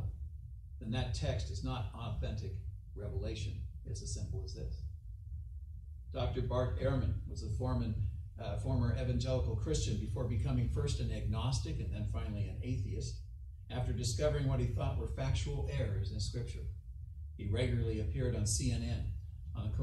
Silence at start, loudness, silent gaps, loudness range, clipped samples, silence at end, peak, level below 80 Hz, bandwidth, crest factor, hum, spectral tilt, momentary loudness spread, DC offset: 0 s; -38 LUFS; none; 6 LU; under 0.1%; 0 s; -20 dBFS; -42 dBFS; 12 kHz; 18 dB; none; -6 dB/octave; 13 LU; under 0.1%